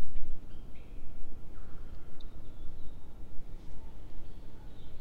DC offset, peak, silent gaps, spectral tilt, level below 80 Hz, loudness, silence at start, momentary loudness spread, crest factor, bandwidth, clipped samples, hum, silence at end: under 0.1%; -12 dBFS; none; -7 dB/octave; -40 dBFS; -51 LUFS; 0 s; 4 LU; 14 dB; 3.8 kHz; under 0.1%; none; 0 s